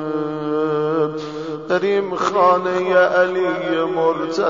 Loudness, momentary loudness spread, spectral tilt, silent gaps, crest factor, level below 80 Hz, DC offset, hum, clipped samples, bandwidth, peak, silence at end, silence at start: -19 LUFS; 8 LU; -6 dB/octave; none; 14 dB; -60 dBFS; 0.2%; none; under 0.1%; 7.6 kHz; -4 dBFS; 0 s; 0 s